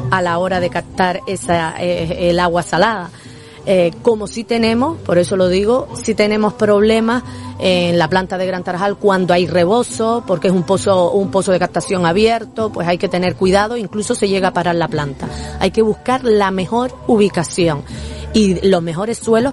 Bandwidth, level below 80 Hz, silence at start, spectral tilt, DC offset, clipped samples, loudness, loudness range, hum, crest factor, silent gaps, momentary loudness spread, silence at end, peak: 11.5 kHz; -40 dBFS; 0 s; -5.5 dB/octave; under 0.1%; under 0.1%; -16 LUFS; 2 LU; none; 16 dB; none; 7 LU; 0 s; 0 dBFS